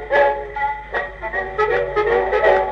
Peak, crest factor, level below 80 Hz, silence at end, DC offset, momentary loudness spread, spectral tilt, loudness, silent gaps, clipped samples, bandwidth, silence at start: -2 dBFS; 16 dB; -40 dBFS; 0 s; under 0.1%; 9 LU; -6 dB/octave; -19 LUFS; none; under 0.1%; 7.2 kHz; 0 s